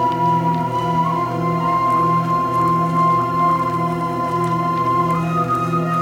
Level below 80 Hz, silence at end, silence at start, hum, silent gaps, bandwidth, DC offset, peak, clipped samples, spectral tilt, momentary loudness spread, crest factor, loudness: -50 dBFS; 0 s; 0 s; none; none; 16.5 kHz; under 0.1%; -6 dBFS; under 0.1%; -7.5 dB/octave; 4 LU; 12 dB; -18 LUFS